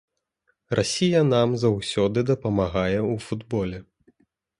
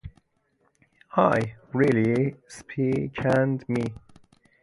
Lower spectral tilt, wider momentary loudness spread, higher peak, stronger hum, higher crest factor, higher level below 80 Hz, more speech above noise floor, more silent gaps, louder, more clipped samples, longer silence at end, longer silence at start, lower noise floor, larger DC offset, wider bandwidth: second, -6 dB/octave vs -8 dB/octave; about the same, 9 LU vs 9 LU; about the same, -6 dBFS vs -6 dBFS; neither; about the same, 18 dB vs 20 dB; first, -48 dBFS vs -54 dBFS; first, 49 dB vs 45 dB; neither; about the same, -23 LUFS vs -25 LUFS; neither; first, 0.8 s vs 0.65 s; first, 0.7 s vs 0.05 s; about the same, -72 dBFS vs -69 dBFS; neither; about the same, 11.5 kHz vs 11.5 kHz